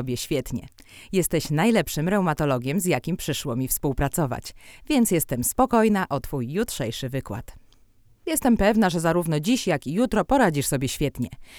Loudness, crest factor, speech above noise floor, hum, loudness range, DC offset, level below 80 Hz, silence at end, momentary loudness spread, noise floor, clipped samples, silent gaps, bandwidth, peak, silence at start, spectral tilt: -23 LUFS; 18 dB; 32 dB; none; 3 LU; under 0.1%; -42 dBFS; 0 s; 10 LU; -56 dBFS; under 0.1%; none; over 20 kHz; -6 dBFS; 0 s; -5 dB/octave